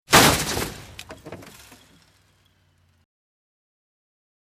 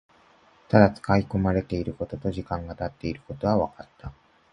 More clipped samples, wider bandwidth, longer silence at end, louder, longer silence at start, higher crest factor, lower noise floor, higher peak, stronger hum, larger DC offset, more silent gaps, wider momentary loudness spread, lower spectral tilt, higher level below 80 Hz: neither; first, 16 kHz vs 9.8 kHz; first, 3.05 s vs 0.4 s; first, -19 LUFS vs -25 LUFS; second, 0.1 s vs 0.7 s; about the same, 26 dB vs 24 dB; first, -62 dBFS vs -58 dBFS; about the same, 0 dBFS vs -2 dBFS; neither; neither; neither; first, 27 LU vs 18 LU; second, -2.5 dB/octave vs -8.5 dB/octave; about the same, -46 dBFS vs -44 dBFS